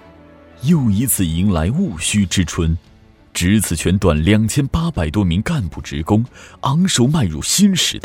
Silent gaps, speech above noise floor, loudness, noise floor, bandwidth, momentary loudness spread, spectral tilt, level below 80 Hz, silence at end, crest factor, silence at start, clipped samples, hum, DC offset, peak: none; 27 dB; -17 LUFS; -43 dBFS; 16.5 kHz; 8 LU; -5 dB/octave; -32 dBFS; 0.05 s; 16 dB; 0.6 s; under 0.1%; none; under 0.1%; 0 dBFS